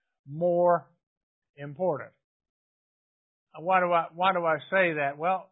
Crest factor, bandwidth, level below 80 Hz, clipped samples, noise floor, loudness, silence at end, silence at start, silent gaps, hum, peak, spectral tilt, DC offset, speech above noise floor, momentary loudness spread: 20 dB; 4 kHz; -78 dBFS; under 0.1%; under -90 dBFS; -27 LUFS; 0.1 s; 0.25 s; 1.03-1.42 s, 1.49-1.54 s, 2.24-2.40 s, 2.49-3.47 s; none; -10 dBFS; -9.5 dB/octave; under 0.1%; over 64 dB; 17 LU